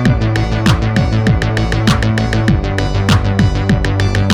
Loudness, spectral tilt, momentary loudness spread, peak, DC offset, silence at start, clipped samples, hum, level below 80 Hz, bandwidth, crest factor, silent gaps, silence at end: -14 LUFS; -6.5 dB/octave; 2 LU; 0 dBFS; under 0.1%; 0 s; under 0.1%; none; -20 dBFS; 12.5 kHz; 12 dB; none; 0 s